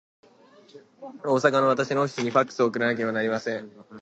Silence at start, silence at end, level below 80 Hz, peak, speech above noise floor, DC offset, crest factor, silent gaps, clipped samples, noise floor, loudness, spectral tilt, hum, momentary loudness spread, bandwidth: 0.75 s; 0 s; -74 dBFS; -4 dBFS; 29 dB; under 0.1%; 22 dB; none; under 0.1%; -54 dBFS; -24 LUFS; -5.5 dB/octave; none; 15 LU; 8.4 kHz